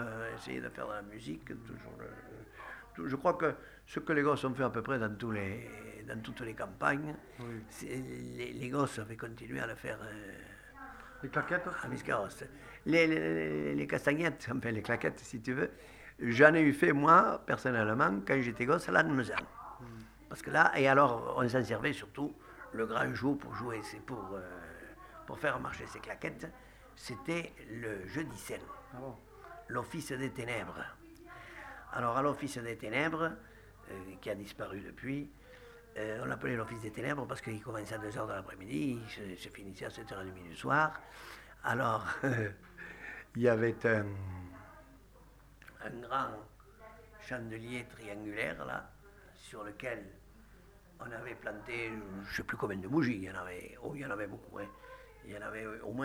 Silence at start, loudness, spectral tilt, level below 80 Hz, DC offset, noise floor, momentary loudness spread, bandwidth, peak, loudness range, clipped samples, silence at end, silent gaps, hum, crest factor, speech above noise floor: 0 s; -35 LUFS; -6 dB/octave; -62 dBFS; under 0.1%; -59 dBFS; 19 LU; over 20 kHz; -6 dBFS; 13 LU; under 0.1%; 0 s; none; none; 30 dB; 24 dB